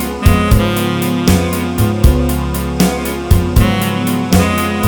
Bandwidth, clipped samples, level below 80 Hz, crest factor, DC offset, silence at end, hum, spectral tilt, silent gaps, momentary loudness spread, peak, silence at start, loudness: over 20 kHz; 0.3%; -18 dBFS; 12 dB; 0.4%; 0 s; none; -5.5 dB/octave; none; 5 LU; 0 dBFS; 0 s; -14 LUFS